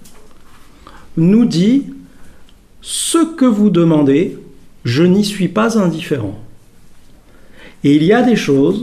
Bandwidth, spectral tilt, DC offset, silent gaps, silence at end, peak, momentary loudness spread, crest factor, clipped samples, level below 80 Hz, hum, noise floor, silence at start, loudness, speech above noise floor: 15 kHz; -6 dB/octave; under 0.1%; none; 0 s; 0 dBFS; 12 LU; 14 dB; under 0.1%; -46 dBFS; none; -40 dBFS; 0 s; -13 LUFS; 28 dB